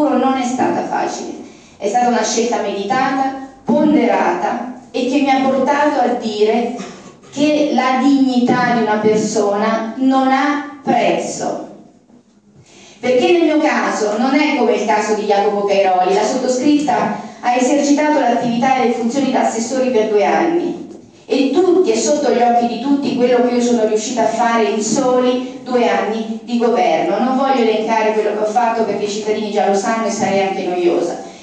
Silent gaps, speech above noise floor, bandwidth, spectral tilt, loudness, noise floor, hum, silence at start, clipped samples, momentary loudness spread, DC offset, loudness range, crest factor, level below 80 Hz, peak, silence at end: none; 34 dB; 9.6 kHz; -4.5 dB/octave; -15 LUFS; -48 dBFS; none; 0 s; under 0.1%; 8 LU; under 0.1%; 3 LU; 14 dB; -64 dBFS; -2 dBFS; 0 s